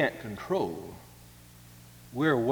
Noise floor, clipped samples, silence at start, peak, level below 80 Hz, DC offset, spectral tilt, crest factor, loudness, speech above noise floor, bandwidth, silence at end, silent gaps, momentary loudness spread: -52 dBFS; under 0.1%; 0 s; -12 dBFS; -60 dBFS; under 0.1%; -6.5 dB/octave; 20 dB; -31 LUFS; 23 dB; over 20 kHz; 0 s; none; 24 LU